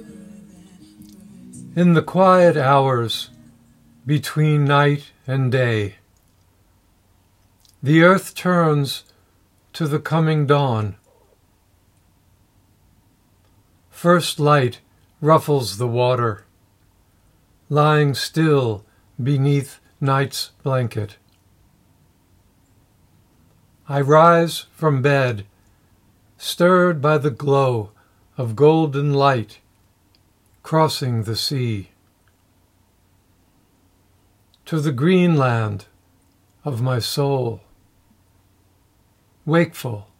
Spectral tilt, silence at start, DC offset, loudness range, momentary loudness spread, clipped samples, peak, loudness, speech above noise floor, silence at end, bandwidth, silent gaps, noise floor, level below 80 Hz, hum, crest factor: -6.5 dB/octave; 0 s; under 0.1%; 8 LU; 16 LU; under 0.1%; 0 dBFS; -18 LUFS; 42 dB; 0.15 s; 16 kHz; none; -59 dBFS; -62 dBFS; none; 20 dB